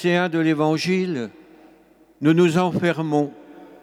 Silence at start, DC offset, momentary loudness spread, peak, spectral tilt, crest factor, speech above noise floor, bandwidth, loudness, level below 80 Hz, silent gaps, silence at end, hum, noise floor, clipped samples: 0 s; under 0.1%; 10 LU; -6 dBFS; -6.5 dB/octave; 16 dB; 34 dB; 13.5 kHz; -20 LUFS; -66 dBFS; none; 0.15 s; none; -53 dBFS; under 0.1%